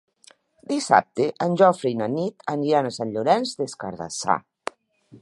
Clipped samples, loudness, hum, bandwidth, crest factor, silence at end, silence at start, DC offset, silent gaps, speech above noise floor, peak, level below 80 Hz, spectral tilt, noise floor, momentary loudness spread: under 0.1%; -23 LUFS; none; 11.5 kHz; 22 dB; 0.05 s; 0.7 s; under 0.1%; none; 34 dB; -2 dBFS; -66 dBFS; -5 dB/octave; -56 dBFS; 12 LU